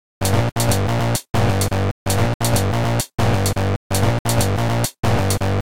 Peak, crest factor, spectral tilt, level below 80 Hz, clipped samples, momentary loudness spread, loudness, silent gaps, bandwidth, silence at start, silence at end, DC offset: -4 dBFS; 14 dB; -5 dB/octave; -34 dBFS; under 0.1%; 2 LU; -19 LUFS; 1.30-1.34 s, 1.91-2.06 s, 2.34-2.40 s, 3.76-3.90 s, 4.19-4.25 s, 4.99-5.03 s; 17 kHz; 0.2 s; 0.15 s; 4%